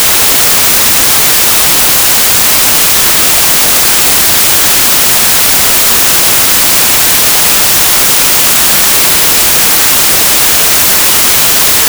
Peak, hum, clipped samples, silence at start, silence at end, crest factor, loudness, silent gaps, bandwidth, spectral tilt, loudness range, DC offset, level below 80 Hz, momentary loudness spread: 0 dBFS; none; 2%; 0 s; 0 s; 6 dB; -3 LUFS; none; over 20 kHz; 0 dB/octave; 0 LU; under 0.1%; -32 dBFS; 0 LU